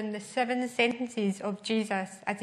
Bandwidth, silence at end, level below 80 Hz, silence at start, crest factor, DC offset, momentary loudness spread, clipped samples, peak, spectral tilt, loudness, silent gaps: 13 kHz; 0 s; -78 dBFS; 0 s; 20 dB; under 0.1%; 6 LU; under 0.1%; -12 dBFS; -4.5 dB/octave; -30 LUFS; none